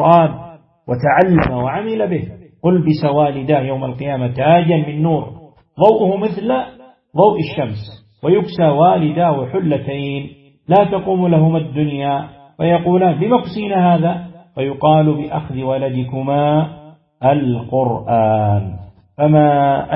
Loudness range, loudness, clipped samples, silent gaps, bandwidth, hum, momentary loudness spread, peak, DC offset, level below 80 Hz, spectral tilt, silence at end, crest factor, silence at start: 2 LU; -15 LUFS; under 0.1%; none; 5.8 kHz; none; 11 LU; 0 dBFS; under 0.1%; -46 dBFS; -11 dB/octave; 0 s; 16 dB; 0 s